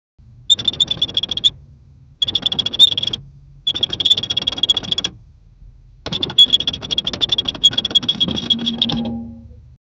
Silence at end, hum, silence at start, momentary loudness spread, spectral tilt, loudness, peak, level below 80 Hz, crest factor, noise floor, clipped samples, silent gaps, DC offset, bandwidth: 0.45 s; none; 0.4 s; 12 LU; -2.5 dB/octave; -15 LUFS; 0 dBFS; -44 dBFS; 20 dB; -45 dBFS; under 0.1%; none; under 0.1%; over 20 kHz